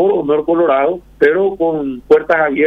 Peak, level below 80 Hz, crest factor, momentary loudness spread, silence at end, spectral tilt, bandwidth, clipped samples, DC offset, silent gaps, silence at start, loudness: 0 dBFS; -46 dBFS; 12 dB; 5 LU; 0 s; -7.5 dB/octave; 5.4 kHz; under 0.1%; under 0.1%; none; 0 s; -14 LUFS